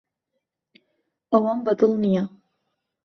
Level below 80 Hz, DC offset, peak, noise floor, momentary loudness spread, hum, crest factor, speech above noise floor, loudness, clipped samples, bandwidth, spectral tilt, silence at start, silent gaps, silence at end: -68 dBFS; under 0.1%; -6 dBFS; -80 dBFS; 5 LU; none; 20 dB; 59 dB; -22 LUFS; under 0.1%; 6.4 kHz; -9 dB/octave; 1.3 s; none; 0.75 s